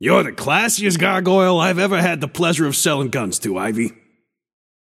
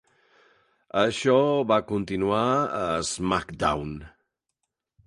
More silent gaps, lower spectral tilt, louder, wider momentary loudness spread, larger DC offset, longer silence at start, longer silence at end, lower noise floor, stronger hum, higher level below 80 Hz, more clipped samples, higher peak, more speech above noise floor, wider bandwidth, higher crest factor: neither; about the same, -4 dB/octave vs -5 dB/octave; first, -17 LUFS vs -25 LUFS; second, 6 LU vs 9 LU; neither; second, 0 s vs 0.95 s; about the same, 1.05 s vs 1 s; second, -64 dBFS vs -81 dBFS; neither; second, -60 dBFS vs -50 dBFS; neither; first, -2 dBFS vs -8 dBFS; second, 47 dB vs 57 dB; first, 16 kHz vs 11.5 kHz; about the same, 16 dB vs 18 dB